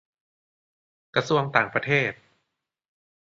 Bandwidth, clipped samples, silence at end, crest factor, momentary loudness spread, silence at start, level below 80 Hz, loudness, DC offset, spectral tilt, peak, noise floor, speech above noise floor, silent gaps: 7.6 kHz; under 0.1%; 1.2 s; 26 dB; 6 LU; 1.15 s; -66 dBFS; -24 LUFS; under 0.1%; -5.5 dB/octave; -2 dBFS; -80 dBFS; 56 dB; none